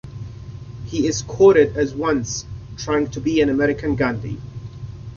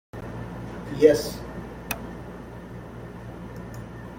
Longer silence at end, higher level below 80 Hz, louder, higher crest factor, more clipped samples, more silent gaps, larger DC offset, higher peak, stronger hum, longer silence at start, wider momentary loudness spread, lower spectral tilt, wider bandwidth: about the same, 0 s vs 0 s; about the same, -42 dBFS vs -46 dBFS; first, -19 LUFS vs -27 LUFS; second, 18 dB vs 24 dB; neither; neither; neither; about the same, -2 dBFS vs -4 dBFS; neither; about the same, 0.05 s vs 0.15 s; about the same, 21 LU vs 21 LU; about the same, -5.5 dB/octave vs -5.5 dB/octave; second, 7.2 kHz vs 16.5 kHz